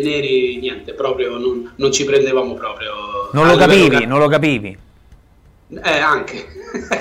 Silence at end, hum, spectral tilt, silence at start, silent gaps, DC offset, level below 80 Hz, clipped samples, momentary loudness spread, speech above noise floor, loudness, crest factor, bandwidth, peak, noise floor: 0 s; none; -4.5 dB/octave; 0 s; none; under 0.1%; -46 dBFS; under 0.1%; 15 LU; 33 dB; -15 LUFS; 14 dB; 15.5 kHz; -2 dBFS; -49 dBFS